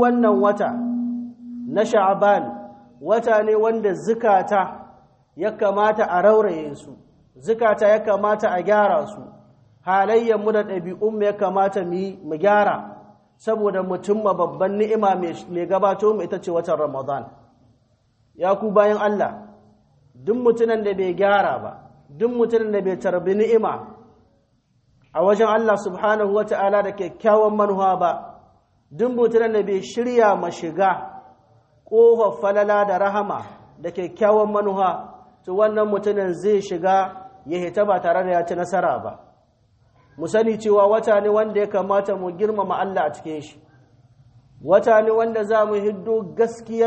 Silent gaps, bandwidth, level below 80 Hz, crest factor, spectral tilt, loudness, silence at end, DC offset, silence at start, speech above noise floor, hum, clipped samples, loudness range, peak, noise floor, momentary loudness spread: none; 8.4 kHz; -64 dBFS; 18 dB; -6.5 dB/octave; -20 LUFS; 0 s; under 0.1%; 0 s; 44 dB; none; under 0.1%; 3 LU; -2 dBFS; -63 dBFS; 12 LU